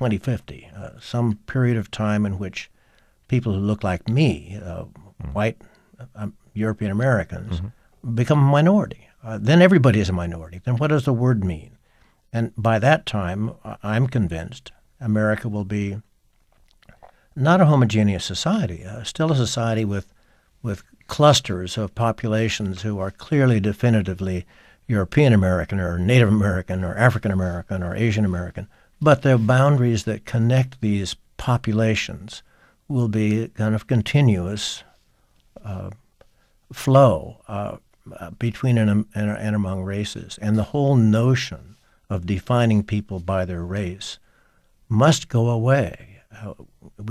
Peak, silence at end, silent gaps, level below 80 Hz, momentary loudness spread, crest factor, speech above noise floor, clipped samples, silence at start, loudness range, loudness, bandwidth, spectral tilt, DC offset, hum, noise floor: -2 dBFS; 0 s; none; -48 dBFS; 18 LU; 20 dB; 40 dB; under 0.1%; 0 s; 5 LU; -21 LUFS; 13.5 kHz; -6.5 dB/octave; under 0.1%; none; -60 dBFS